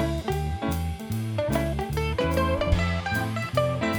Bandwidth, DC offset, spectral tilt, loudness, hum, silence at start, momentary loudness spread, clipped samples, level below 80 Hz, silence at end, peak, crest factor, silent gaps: over 20 kHz; under 0.1%; -6 dB/octave; -27 LUFS; none; 0 s; 5 LU; under 0.1%; -34 dBFS; 0 s; -8 dBFS; 18 dB; none